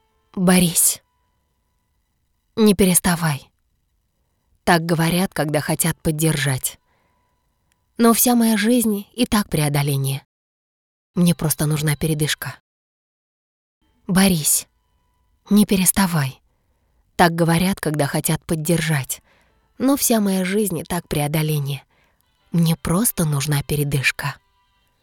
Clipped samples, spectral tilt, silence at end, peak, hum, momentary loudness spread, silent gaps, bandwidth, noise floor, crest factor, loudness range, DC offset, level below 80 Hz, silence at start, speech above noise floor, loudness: under 0.1%; -4.5 dB/octave; 0.7 s; 0 dBFS; none; 11 LU; 10.25-11.14 s, 12.60-13.81 s; 19.5 kHz; -68 dBFS; 20 dB; 3 LU; under 0.1%; -46 dBFS; 0.35 s; 50 dB; -19 LUFS